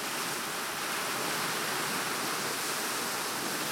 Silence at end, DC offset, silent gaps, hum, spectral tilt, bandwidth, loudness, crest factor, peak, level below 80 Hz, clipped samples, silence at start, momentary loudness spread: 0 s; under 0.1%; none; none; -1 dB/octave; 16.5 kHz; -31 LUFS; 14 dB; -18 dBFS; -74 dBFS; under 0.1%; 0 s; 2 LU